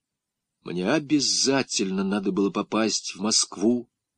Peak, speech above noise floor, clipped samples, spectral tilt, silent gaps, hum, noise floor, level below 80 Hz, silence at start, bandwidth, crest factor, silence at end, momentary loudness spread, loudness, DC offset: -10 dBFS; 60 dB; under 0.1%; -3 dB/octave; none; none; -84 dBFS; -68 dBFS; 0.65 s; 10.5 kHz; 16 dB; 0.35 s; 5 LU; -24 LUFS; under 0.1%